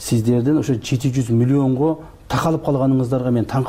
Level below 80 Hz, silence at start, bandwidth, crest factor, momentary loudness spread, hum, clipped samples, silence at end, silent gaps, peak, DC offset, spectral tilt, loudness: -44 dBFS; 0 s; 16 kHz; 10 dB; 4 LU; none; under 0.1%; 0 s; none; -8 dBFS; under 0.1%; -7.5 dB/octave; -18 LUFS